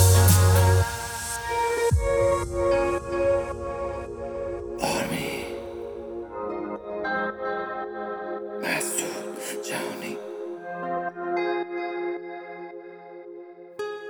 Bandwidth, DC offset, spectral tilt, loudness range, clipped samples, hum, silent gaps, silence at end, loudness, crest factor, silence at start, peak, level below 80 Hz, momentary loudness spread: over 20 kHz; under 0.1%; -5 dB/octave; 8 LU; under 0.1%; none; none; 0 s; -26 LUFS; 20 dB; 0 s; -6 dBFS; -42 dBFS; 14 LU